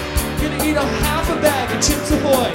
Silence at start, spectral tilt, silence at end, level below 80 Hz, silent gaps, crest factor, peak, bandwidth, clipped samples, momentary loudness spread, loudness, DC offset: 0 s; -4 dB/octave; 0 s; -26 dBFS; none; 16 dB; -2 dBFS; 16.5 kHz; under 0.1%; 4 LU; -18 LUFS; under 0.1%